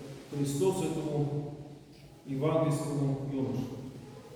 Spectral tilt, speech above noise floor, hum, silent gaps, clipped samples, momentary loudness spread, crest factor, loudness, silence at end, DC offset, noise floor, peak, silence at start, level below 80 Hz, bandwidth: -7 dB/octave; 21 dB; none; none; under 0.1%; 19 LU; 18 dB; -32 LUFS; 0 s; under 0.1%; -52 dBFS; -16 dBFS; 0 s; -62 dBFS; 16 kHz